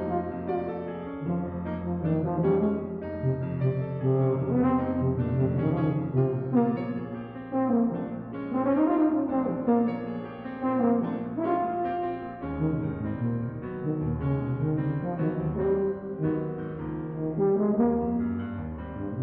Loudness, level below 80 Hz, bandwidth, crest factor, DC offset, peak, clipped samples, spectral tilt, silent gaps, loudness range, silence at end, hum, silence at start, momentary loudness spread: -28 LUFS; -50 dBFS; 4.2 kHz; 16 dB; under 0.1%; -10 dBFS; under 0.1%; -10 dB/octave; none; 3 LU; 0 s; none; 0 s; 10 LU